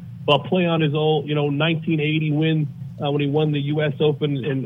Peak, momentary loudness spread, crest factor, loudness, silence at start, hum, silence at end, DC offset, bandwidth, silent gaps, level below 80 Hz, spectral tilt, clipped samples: -2 dBFS; 4 LU; 18 dB; -21 LUFS; 0 s; none; 0 s; under 0.1%; 3.9 kHz; none; -62 dBFS; -9 dB/octave; under 0.1%